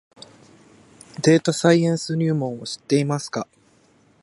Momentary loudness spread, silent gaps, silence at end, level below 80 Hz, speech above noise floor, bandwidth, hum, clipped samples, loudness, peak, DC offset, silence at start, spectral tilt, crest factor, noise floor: 14 LU; none; 0.8 s; -66 dBFS; 37 dB; 11.5 kHz; none; under 0.1%; -21 LUFS; -2 dBFS; under 0.1%; 1.2 s; -5.5 dB/octave; 20 dB; -57 dBFS